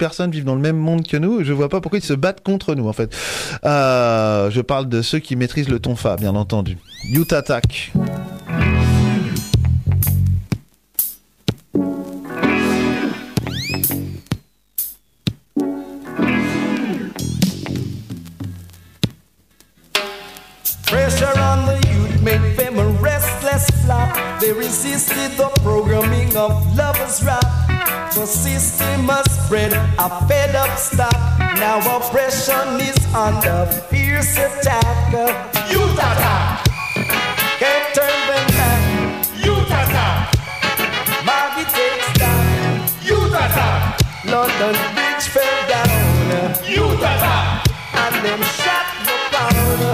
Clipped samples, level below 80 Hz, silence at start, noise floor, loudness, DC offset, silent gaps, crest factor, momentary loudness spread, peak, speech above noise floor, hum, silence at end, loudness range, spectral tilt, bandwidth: under 0.1%; -30 dBFS; 0 s; -54 dBFS; -17 LUFS; under 0.1%; none; 14 dB; 9 LU; -4 dBFS; 37 dB; none; 0 s; 6 LU; -4.5 dB/octave; 16 kHz